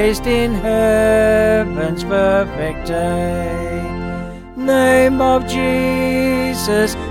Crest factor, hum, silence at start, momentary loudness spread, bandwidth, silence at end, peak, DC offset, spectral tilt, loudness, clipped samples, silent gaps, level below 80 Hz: 14 dB; none; 0 s; 11 LU; 17 kHz; 0 s; -2 dBFS; under 0.1%; -5.5 dB/octave; -16 LUFS; under 0.1%; none; -32 dBFS